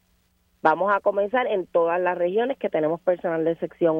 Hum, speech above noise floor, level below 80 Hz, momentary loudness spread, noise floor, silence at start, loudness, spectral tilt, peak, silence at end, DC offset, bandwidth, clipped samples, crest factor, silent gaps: none; 43 dB; -66 dBFS; 3 LU; -65 dBFS; 0.65 s; -23 LUFS; -8 dB/octave; -4 dBFS; 0 s; under 0.1%; 5.4 kHz; under 0.1%; 20 dB; none